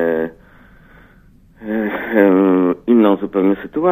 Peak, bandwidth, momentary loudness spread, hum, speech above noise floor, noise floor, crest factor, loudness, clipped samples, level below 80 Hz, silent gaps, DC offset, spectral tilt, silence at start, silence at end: 0 dBFS; 15.5 kHz; 11 LU; none; 34 dB; -47 dBFS; 16 dB; -15 LUFS; under 0.1%; -50 dBFS; none; under 0.1%; -9.5 dB/octave; 0 s; 0 s